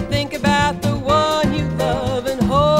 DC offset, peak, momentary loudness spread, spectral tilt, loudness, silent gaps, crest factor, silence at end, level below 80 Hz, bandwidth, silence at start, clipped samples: under 0.1%; -2 dBFS; 5 LU; -5.5 dB/octave; -18 LUFS; none; 14 dB; 0 s; -34 dBFS; 16 kHz; 0 s; under 0.1%